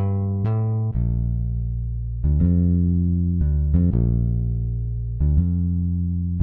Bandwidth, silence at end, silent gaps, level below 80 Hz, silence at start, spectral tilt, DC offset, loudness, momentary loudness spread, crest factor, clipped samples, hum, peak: 2.1 kHz; 0 s; none; -26 dBFS; 0 s; -14 dB/octave; under 0.1%; -22 LUFS; 7 LU; 12 dB; under 0.1%; none; -8 dBFS